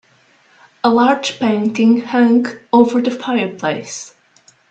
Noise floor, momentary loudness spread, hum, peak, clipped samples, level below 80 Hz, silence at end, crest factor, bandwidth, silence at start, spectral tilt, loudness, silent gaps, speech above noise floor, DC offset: -53 dBFS; 10 LU; none; 0 dBFS; under 0.1%; -62 dBFS; 0.65 s; 16 dB; 8.4 kHz; 0.85 s; -5 dB/octave; -15 LUFS; none; 38 dB; under 0.1%